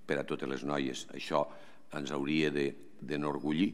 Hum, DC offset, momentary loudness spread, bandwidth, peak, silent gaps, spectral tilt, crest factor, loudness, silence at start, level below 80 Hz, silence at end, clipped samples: none; 0.4%; 10 LU; 13 kHz; -16 dBFS; none; -5.5 dB/octave; 20 dB; -35 LUFS; 0.1 s; -72 dBFS; 0 s; under 0.1%